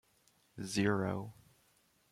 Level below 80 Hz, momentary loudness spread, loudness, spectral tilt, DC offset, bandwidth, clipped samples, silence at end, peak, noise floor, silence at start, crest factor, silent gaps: -70 dBFS; 18 LU; -36 LUFS; -5.5 dB/octave; under 0.1%; 15.5 kHz; under 0.1%; 0.8 s; -18 dBFS; -72 dBFS; 0.55 s; 20 dB; none